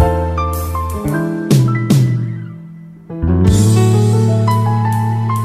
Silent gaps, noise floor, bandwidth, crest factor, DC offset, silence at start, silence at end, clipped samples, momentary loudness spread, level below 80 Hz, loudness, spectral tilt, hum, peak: none; -34 dBFS; 15 kHz; 14 dB; under 0.1%; 0 s; 0 s; under 0.1%; 13 LU; -28 dBFS; -14 LUFS; -7 dB/octave; none; 0 dBFS